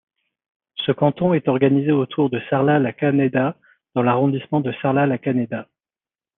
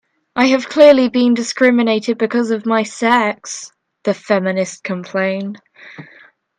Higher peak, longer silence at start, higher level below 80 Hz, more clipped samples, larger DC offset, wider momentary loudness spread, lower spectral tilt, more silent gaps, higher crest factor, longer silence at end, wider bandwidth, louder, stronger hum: about the same, -2 dBFS vs 0 dBFS; first, 0.75 s vs 0.35 s; about the same, -64 dBFS vs -64 dBFS; neither; neither; second, 8 LU vs 17 LU; first, -10.5 dB/octave vs -4.5 dB/octave; neither; about the same, 18 dB vs 16 dB; first, 0.75 s vs 0.55 s; second, 3.9 kHz vs 9.8 kHz; second, -20 LUFS vs -15 LUFS; neither